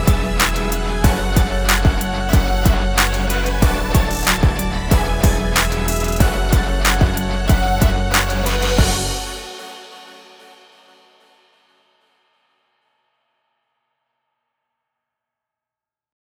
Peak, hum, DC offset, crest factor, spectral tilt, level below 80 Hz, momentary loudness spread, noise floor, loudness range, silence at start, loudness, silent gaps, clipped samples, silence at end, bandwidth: 0 dBFS; none; under 0.1%; 18 dB; -4.5 dB/octave; -22 dBFS; 6 LU; -89 dBFS; 6 LU; 0 s; -17 LUFS; none; under 0.1%; 6.1 s; over 20 kHz